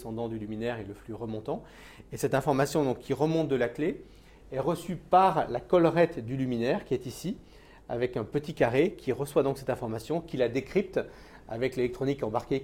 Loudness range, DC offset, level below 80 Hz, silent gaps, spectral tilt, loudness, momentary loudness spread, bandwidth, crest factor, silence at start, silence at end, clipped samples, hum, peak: 3 LU; under 0.1%; -54 dBFS; none; -6.5 dB/octave; -29 LUFS; 13 LU; 16.5 kHz; 20 dB; 0 s; 0 s; under 0.1%; none; -10 dBFS